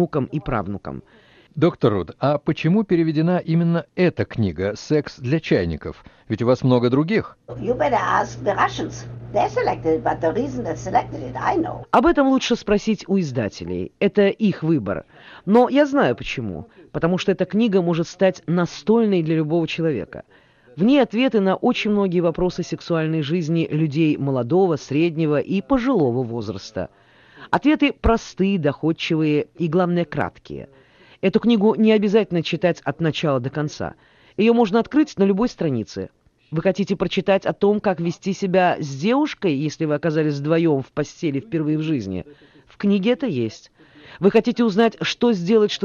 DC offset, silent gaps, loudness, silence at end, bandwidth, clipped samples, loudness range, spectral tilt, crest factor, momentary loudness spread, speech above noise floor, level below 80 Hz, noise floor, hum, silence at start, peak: under 0.1%; none; -20 LUFS; 0 s; 7.2 kHz; under 0.1%; 2 LU; -7 dB/octave; 16 dB; 11 LU; 26 dB; -46 dBFS; -46 dBFS; none; 0 s; -4 dBFS